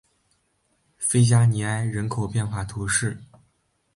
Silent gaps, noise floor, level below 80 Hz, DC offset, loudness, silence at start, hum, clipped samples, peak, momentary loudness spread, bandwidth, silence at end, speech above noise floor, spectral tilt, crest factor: none; -69 dBFS; -50 dBFS; under 0.1%; -23 LUFS; 1 s; none; under 0.1%; -8 dBFS; 11 LU; 11.5 kHz; 0.7 s; 47 dB; -5 dB/octave; 16 dB